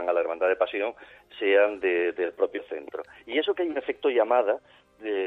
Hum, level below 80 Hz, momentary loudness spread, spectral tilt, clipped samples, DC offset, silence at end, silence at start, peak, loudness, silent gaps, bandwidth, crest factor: none; -70 dBFS; 14 LU; -5 dB/octave; under 0.1%; under 0.1%; 0 s; 0 s; -10 dBFS; -26 LUFS; none; 4.1 kHz; 16 dB